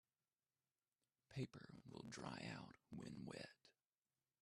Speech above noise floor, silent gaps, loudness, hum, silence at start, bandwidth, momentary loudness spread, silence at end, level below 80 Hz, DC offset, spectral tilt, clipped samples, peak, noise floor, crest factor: over 36 dB; none; -55 LUFS; none; 1.3 s; 12.5 kHz; 8 LU; 0.7 s; -82 dBFS; under 0.1%; -5.5 dB/octave; under 0.1%; -36 dBFS; under -90 dBFS; 22 dB